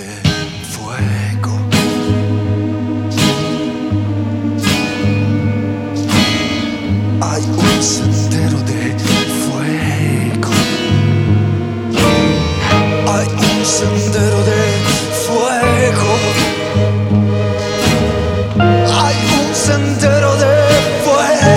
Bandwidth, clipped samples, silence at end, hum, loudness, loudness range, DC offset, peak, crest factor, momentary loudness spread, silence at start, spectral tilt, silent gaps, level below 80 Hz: 16.5 kHz; under 0.1%; 0 s; none; -14 LUFS; 3 LU; under 0.1%; 0 dBFS; 14 dB; 6 LU; 0 s; -5 dB/octave; none; -34 dBFS